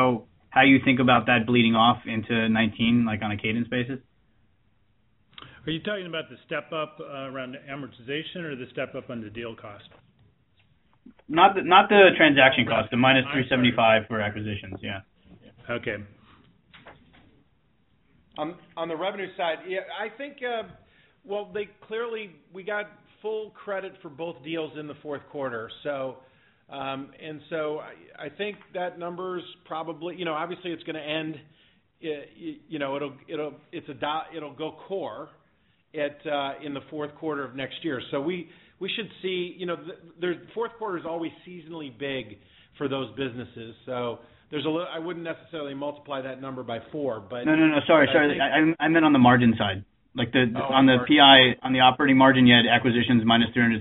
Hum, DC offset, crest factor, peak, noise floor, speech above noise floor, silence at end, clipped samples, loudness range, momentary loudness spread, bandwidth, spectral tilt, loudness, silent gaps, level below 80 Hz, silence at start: none; under 0.1%; 24 dB; -2 dBFS; -67 dBFS; 43 dB; 0 s; under 0.1%; 16 LU; 19 LU; 4.1 kHz; -2.5 dB/octave; -24 LUFS; none; -60 dBFS; 0 s